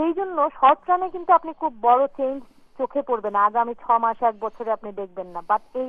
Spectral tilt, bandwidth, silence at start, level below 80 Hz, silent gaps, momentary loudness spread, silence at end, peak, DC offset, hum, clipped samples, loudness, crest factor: -7 dB/octave; 4.6 kHz; 0 s; -60 dBFS; none; 12 LU; 0 s; -4 dBFS; under 0.1%; none; under 0.1%; -22 LUFS; 18 dB